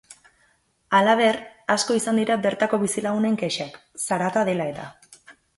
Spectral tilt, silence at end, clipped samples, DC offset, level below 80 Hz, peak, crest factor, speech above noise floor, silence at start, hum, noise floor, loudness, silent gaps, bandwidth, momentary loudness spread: -4 dB/octave; 0.25 s; under 0.1%; under 0.1%; -66 dBFS; -4 dBFS; 18 dB; 42 dB; 0.1 s; none; -64 dBFS; -22 LUFS; none; 12 kHz; 12 LU